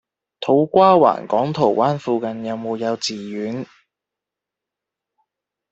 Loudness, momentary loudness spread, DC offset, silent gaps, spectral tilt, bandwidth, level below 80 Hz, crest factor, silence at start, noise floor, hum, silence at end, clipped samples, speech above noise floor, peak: -18 LUFS; 14 LU; under 0.1%; none; -6 dB/octave; 8.2 kHz; -64 dBFS; 18 dB; 0.4 s; -85 dBFS; none; 2.05 s; under 0.1%; 68 dB; -2 dBFS